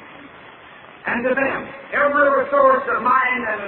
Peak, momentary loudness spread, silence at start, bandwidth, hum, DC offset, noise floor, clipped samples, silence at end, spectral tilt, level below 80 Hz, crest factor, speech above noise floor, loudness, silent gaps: -4 dBFS; 9 LU; 0 s; 4.2 kHz; none; under 0.1%; -42 dBFS; under 0.1%; 0 s; -8.5 dB/octave; -58 dBFS; 16 dB; 24 dB; -18 LUFS; none